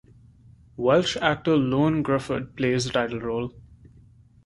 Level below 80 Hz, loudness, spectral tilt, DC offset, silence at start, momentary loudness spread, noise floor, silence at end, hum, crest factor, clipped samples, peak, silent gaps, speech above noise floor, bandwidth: -52 dBFS; -24 LUFS; -5.5 dB/octave; under 0.1%; 0.8 s; 9 LU; -53 dBFS; 0.85 s; none; 22 dB; under 0.1%; -4 dBFS; none; 30 dB; 11.5 kHz